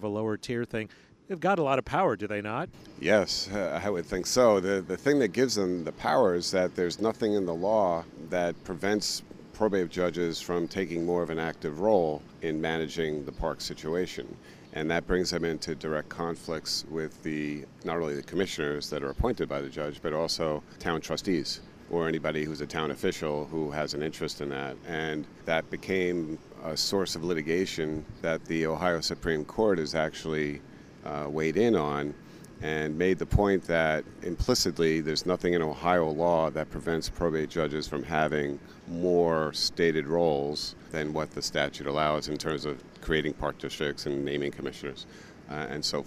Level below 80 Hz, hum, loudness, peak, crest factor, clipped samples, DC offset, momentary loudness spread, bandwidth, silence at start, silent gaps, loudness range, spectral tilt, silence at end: -48 dBFS; none; -29 LUFS; -10 dBFS; 20 dB; under 0.1%; under 0.1%; 10 LU; 15.5 kHz; 0 s; none; 5 LU; -4.5 dB/octave; 0 s